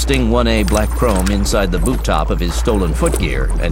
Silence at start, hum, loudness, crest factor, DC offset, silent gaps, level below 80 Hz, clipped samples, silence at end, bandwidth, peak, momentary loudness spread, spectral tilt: 0 s; none; -16 LUFS; 14 dB; under 0.1%; none; -18 dBFS; under 0.1%; 0 s; 16.5 kHz; 0 dBFS; 4 LU; -5 dB/octave